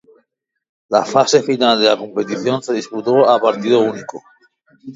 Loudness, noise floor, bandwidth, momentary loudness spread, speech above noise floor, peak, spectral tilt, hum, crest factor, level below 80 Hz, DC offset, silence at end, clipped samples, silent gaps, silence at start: -15 LUFS; -68 dBFS; 7.8 kHz; 9 LU; 53 dB; 0 dBFS; -4 dB/octave; none; 16 dB; -66 dBFS; under 0.1%; 0 s; under 0.1%; none; 0.9 s